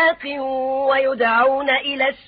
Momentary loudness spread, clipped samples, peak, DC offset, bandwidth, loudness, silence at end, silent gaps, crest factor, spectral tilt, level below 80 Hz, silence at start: 7 LU; under 0.1%; -6 dBFS; under 0.1%; 5 kHz; -18 LUFS; 0.1 s; none; 14 dB; -7.5 dB/octave; -58 dBFS; 0 s